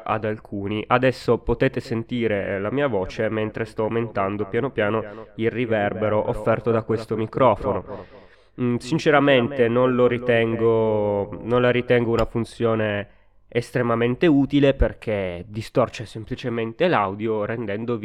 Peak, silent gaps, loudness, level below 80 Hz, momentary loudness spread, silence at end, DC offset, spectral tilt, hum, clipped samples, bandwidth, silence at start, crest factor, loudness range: -2 dBFS; none; -22 LUFS; -40 dBFS; 9 LU; 0 s; 0.2%; -7 dB/octave; none; under 0.1%; 11.5 kHz; 0 s; 20 dB; 4 LU